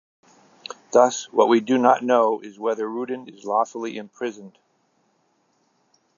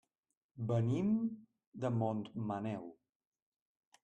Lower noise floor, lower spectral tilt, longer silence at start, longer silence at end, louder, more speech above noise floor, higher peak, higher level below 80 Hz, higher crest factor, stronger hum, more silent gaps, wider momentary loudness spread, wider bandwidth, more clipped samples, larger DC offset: second, -67 dBFS vs under -90 dBFS; second, -4 dB/octave vs -9 dB/octave; first, 0.9 s vs 0.55 s; first, 1.7 s vs 1.1 s; first, -22 LUFS vs -38 LUFS; second, 46 dB vs over 54 dB; first, -2 dBFS vs -22 dBFS; second, -84 dBFS vs -76 dBFS; first, 22 dB vs 16 dB; neither; second, none vs 1.67-1.72 s; about the same, 14 LU vs 16 LU; second, 7.4 kHz vs 8.4 kHz; neither; neither